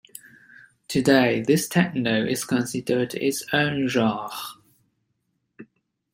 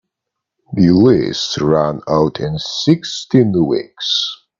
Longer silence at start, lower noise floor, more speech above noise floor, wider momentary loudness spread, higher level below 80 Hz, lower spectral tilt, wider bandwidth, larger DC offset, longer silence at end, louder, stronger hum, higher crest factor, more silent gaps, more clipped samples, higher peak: first, 0.9 s vs 0.7 s; second, -74 dBFS vs -80 dBFS; second, 52 dB vs 65 dB; first, 14 LU vs 8 LU; second, -62 dBFS vs -46 dBFS; about the same, -5 dB/octave vs -6 dB/octave; first, 16.5 kHz vs 7.6 kHz; neither; first, 0.5 s vs 0.25 s; second, -23 LUFS vs -15 LUFS; neither; first, 22 dB vs 16 dB; neither; neither; about the same, -2 dBFS vs 0 dBFS